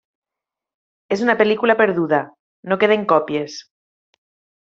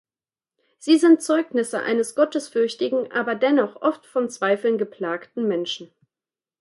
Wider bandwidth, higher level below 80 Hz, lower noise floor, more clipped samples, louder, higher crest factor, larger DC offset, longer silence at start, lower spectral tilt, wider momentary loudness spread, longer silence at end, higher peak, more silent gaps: second, 7.6 kHz vs 11.5 kHz; first, -66 dBFS vs -78 dBFS; about the same, -87 dBFS vs under -90 dBFS; neither; first, -18 LUFS vs -22 LUFS; about the same, 18 dB vs 18 dB; neither; first, 1.1 s vs 0.85 s; about the same, -3.5 dB/octave vs -4 dB/octave; first, 17 LU vs 10 LU; first, 1 s vs 0.75 s; about the same, -2 dBFS vs -4 dBFS; first, 2.39-2.63 s vs none